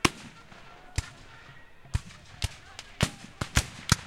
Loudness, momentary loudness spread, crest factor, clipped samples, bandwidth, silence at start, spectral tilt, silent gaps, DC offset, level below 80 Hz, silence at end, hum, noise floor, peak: -32 LUFS; 21 LU; 32 dB; under 0.1%; 16.5 kHz; 0.05 s; -3.5 dB/octave; none; under 0.1%; -40 dBFS; 0 s; none; -49 dBFS; -2 dBFS